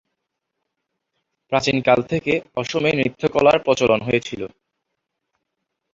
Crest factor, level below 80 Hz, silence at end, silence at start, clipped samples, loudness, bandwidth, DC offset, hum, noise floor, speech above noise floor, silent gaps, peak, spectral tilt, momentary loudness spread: 20 dB; -54 dBFS; 1.45 s; 1.5 s; under 0.1%; -19 LUFS; 7.8 kHz; under 0.1%; none; -78 dBFS; 60 dB; none; -2 dBFS; -5 dB/octave; 9 LU